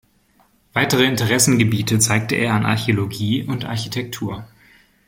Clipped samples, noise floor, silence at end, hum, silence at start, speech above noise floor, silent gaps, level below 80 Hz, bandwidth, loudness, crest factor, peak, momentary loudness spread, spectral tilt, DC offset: under 0.1%; -58 dBFS; 0.6 s; none; 0.75 s; 39 dB; none; -50 dBFS; 16.5 kHz; -18 LUFS; 18 dB; 0 dBFS; 11 LU; -4 dB/octave; under 0.1%